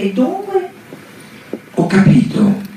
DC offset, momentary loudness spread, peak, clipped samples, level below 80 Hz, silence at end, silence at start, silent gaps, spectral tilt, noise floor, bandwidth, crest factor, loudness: under 0.1%; 21 LU; -2 dBFS; under 0.1%; -48 dBFS; 0 s; 0 s; none; -8 dB/octave; -37 dBFS; 14 kHz; 14 dB; -14 LUFS